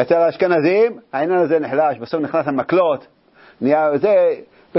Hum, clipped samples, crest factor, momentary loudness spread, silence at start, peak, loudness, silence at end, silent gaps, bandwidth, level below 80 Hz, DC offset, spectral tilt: none; under 0.1%; 16 dB; 8 LU; 0 s; -2 dBFS; -17 LUFS; 0 s; none; 5.8 kHz; -64 dBFS; under 0.1%; -11 dB/octave